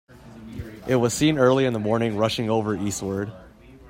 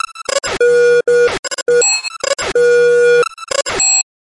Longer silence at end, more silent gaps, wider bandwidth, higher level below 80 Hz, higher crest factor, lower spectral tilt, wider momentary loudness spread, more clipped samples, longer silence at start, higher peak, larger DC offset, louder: second, 0 s vs 0.25 s; second, none vs 1.39-1.43 s; first, 16 kHz vs 11.5 kHz; about the same, -50 dBFS vs -46 dBFS; first, 18 dB vs 10 dB; first, -5.5 dB/octave vs -0.5 dB/octave; first, 16 LU vs 8 LU; neither; about the same, 0.15 s vs 0.1 s; about the same, -6 dBFS vs -4 dBFS; neither; second, -22 LUFS vs -12 LUFS